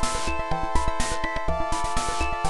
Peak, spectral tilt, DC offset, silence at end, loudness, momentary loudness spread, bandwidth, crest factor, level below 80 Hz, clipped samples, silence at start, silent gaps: -8 dBFS; -3.5 dB/octave; under 0.1%; 0 s; -27 LUFS; 2 LU; 12 kHz; 16 dB; -30 dBFS; under 0.1%; 0 s; none